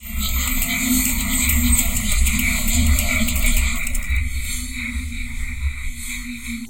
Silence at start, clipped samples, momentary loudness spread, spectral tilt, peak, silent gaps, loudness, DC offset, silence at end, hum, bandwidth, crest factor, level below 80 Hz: 0 s; under 0.1%; 11 LU; -3 dB/octave; -2 dBFS; none; -20 LUFS; 2%; 0 s; none; 17.5 kHz; 18 dB; -22 dBFS